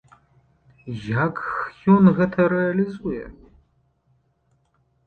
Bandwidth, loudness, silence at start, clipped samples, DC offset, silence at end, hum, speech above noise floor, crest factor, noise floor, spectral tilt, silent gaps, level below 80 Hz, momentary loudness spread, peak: 4.5 kHz; -20 LUFS; 0.85 s; under 0.1%; under 0.1%; 1.75 s; none; 46 dB; 20 dB; -66 dBFS; -10 dB/octave; none; -52 dBFS; 19 LU; -2 dBFS